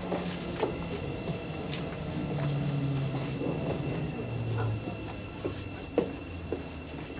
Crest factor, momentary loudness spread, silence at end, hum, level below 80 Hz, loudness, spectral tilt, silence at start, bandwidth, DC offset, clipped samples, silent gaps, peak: 20 dB; 7 LU; 0 s; none; -50 dBFS; -34 LUFS; -10.5 dB/octave; 0 s; 4.9 kHz; under 0.1%; under 0.1%; none; -12 dBFS